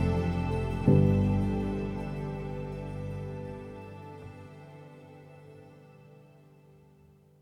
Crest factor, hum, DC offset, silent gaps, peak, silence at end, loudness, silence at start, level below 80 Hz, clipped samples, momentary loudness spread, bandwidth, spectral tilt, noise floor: 22 dB; none; under 0.1%; none; -10 dBFS; 1.2 s; -30 LUFS; 0 s; -44 dBFS; under 0.1%; 26 LU; 10.5 kHz; -9.5 dB/octave; -59 dBFS